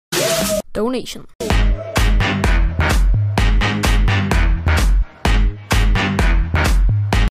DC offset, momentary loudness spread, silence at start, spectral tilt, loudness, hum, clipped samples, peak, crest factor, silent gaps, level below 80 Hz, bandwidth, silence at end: under 0.1%; 4 LU; 0.1 s; -5 dB/octave; -17 LUFS; none; under 0.1%; -6 dBFS; 10 dB; 1.35-1.39 s; -16 dBFS; 15.5 kHz; 0 s